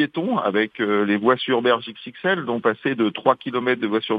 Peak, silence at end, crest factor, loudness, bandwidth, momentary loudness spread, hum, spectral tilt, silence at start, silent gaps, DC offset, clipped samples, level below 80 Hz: 0 dBFS; 0 s; 20 dB; -21 LUFS; 5 kHz; 4 LU; none; -8 dB/octave; 0 s; none; under 0.1%; under 0.1%; -70 dBFS